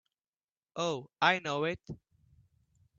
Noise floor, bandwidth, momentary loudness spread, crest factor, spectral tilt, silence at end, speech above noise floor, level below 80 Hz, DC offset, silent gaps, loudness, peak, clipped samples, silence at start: under -90 dBFS; 7.8 kHz; 19 LU; 26 dB; -4 dB/octave; 1.05 s; over 58 dB; -68 dBFS; under 0.1%; none; -32 LUFS; -10 dBFS; under 0.1%; 0.75 s